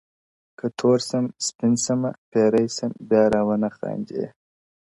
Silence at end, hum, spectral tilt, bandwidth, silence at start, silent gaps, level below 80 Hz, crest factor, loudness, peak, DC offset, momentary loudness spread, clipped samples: 0.65 s; none; -5 dB/octave; 11.5 kHz; 0.65 s; 1.55-1.59 s, 2.18-2.32 s; -58 dBFS; 18 dB; -23 LUFS; -6 dBFS; under 0.1%; 11 LU; under 0.1%